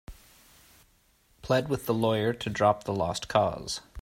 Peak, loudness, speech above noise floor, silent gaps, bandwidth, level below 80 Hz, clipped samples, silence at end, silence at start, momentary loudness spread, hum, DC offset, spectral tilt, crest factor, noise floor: -8 dBFS; -28 LUFS; 38 dB; none; 16 kHz; -54 dBFS; under 0.1%; 0 s; 0.1 s; 7 LU; none; under 0.1%; -5 dB/octave; 22 dB; -65 dBFS